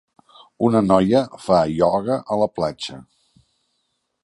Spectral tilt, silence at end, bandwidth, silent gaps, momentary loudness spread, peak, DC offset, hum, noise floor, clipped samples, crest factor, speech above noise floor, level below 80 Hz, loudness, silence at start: -7 dB/octave; 1.2 s; 11.5 kHz; none; 9 LU; -2 dBFS; under 0.1%; none; -72 dBFS; under 0.1%; 20 dB; 54 dB; -52 dBFS; -19 LUFS; 0.6 s